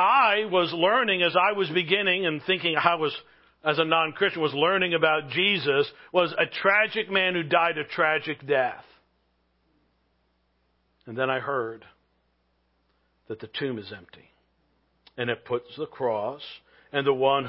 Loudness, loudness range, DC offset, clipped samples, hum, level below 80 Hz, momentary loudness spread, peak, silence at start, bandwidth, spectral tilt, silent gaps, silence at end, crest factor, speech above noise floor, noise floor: -24 LUFS; 12 LU; under 0.1%; under 0.1%; none; -72 dBFS; 13 LU; -4 dBFS; 0 s; 5.8 kHz; -8.5 dB/octave; none; 0 s; 22 dB; 45 dB; -70 dBFS